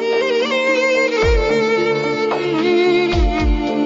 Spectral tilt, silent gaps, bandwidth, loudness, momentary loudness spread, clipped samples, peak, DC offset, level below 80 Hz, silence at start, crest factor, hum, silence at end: -5.5 dB/octave; none; 7.8 kHz; -16 LUFS; 4 LU; under 0.1%; -6 dBFS; under 0.1%; -24 dBFS; 0 s; 10 dB; none; 0 s